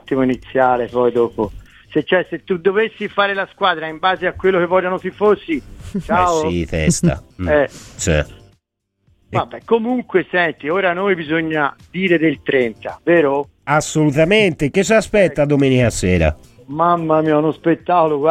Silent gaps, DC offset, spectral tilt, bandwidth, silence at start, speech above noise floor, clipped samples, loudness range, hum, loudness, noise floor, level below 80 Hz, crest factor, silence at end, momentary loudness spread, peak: none; under 0.1%; -5.5 dB/octave; 15 kHz; 0.05 s; 54 dB; under 0.1%; 5 LU; none; -17 LUFS; -70 dBFS; -36 dBFS; 16 dB; 0 s; 8 LU; -2 dBFS